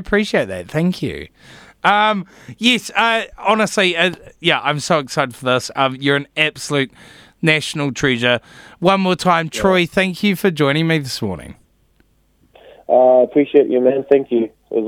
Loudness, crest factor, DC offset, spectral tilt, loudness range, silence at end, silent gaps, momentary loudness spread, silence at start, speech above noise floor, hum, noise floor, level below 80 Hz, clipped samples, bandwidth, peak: -16 LUFS; 18 dB; under 0.1%; -5 dB/octave; 2 LU; 0 s; none; 8 LU; 0 s; 41 dB; none; -57 dBFS; -48 dBFS; under 0.1%; 16.5 kHz; 0 dBFS